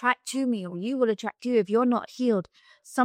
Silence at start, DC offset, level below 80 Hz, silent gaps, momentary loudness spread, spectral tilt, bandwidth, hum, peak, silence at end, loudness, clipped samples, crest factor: 0 s; under 0.1%; -76 dBFS; none; 7 LU; -5 dB/octave; 15 kHz; none; -8 dBFS; 0 s; -27 LUFS; under 0.1%; 18 dB